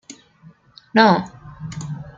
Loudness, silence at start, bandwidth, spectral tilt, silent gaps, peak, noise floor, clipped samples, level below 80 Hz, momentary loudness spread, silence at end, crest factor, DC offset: -17 LUFS; 0.1 s; 7.8 kHz; -5.5 dB/octave; none; -2 dBFS; -50 dBFS; under 0.1%; -54 dBFS; 21 LU; 0.05 s; 20 dB; under 0.1%